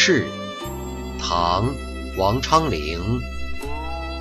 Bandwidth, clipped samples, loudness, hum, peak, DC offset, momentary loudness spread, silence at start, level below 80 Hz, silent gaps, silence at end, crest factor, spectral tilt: 14.5 kHz; under 0.1%; -23 LUFS; none; -4 dBFS; under 0.1%; 12 LU; 0 s; -32 dBFS; none; 0 s; 18 dB; -4.5 dB/octave